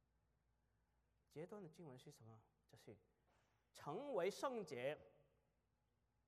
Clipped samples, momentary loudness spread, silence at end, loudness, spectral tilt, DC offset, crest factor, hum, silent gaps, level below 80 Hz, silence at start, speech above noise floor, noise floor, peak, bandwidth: under 0.1%; 22 LU; 1.15 s; -50 LUFS; -5 dB/octave; under 0.1%; 22 dB; none; none; -88 dBFS; 1.35 s; 35 dB; -86 dBFS; -32 dBFS; 13.5 kHz